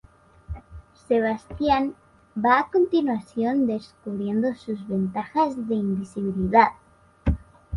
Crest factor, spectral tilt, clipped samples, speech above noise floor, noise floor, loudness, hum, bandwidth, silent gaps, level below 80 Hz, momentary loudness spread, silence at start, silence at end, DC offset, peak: 20 dB; -8 dB/octave; under 0.1%; 23 dB; -46 dBFS; -24 LUFS; none; 11 kHz; none; -40 dBFS; 13 LU; 0.5 s; 0 s; under 0.1%; -4 dBFS